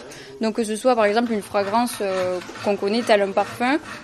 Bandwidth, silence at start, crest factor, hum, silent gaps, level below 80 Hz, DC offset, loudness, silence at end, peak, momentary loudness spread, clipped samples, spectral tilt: 13 kHz; 0 s; 18 dB; none; none; -60 dBFS; under 0.1%; -22 LUFS; 0 s; -4 dBFS; 7 LU; under 0.1%; -4.5 dB/octave